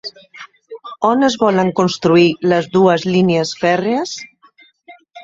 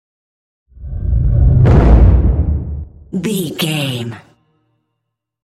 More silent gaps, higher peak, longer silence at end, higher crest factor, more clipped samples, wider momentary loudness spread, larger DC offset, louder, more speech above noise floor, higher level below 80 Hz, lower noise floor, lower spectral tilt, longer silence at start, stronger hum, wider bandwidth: neither; about the same, 0 dBFS vs 0 dBFS; second, 0 s vs 1.25 s; about the same, 16 dB vs 14 dB; neither; about the same, 18 LU vs 18 LU; neither; about the same, -15 LUFS vs -14 LUFS; second, 36 dB vs 56 dB; second, -56 dBFS vs -18 dBFS; second, -50 dBFS vs -75 dBFS; about the same, -5.5 dB/octave vs -6.5 dB/octave; second, 0.05 s vs 0.8 s; neither; second, 7.8 kHz vs 14 kHz